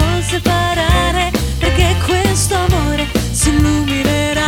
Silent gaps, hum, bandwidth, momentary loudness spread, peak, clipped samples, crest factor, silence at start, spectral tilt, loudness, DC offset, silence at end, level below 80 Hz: none; none; 18 kHz; 3 LU; -2 dBFS; under 0.1%; 12 dB; 0 s; -4.5 dB/octave; -14 LUFS; under 0.1%; 0 s; -20 dBFS